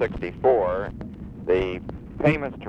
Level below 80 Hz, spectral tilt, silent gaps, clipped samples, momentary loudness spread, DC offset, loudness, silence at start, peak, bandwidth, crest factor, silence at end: -42 dBFS; -8.5 dB/octave; none; under 0.1%; 16 LU; under 0.1%; -24 LUFS; 0 s; -6 dBFS; 8.2 kHz; 18 dB; 0 s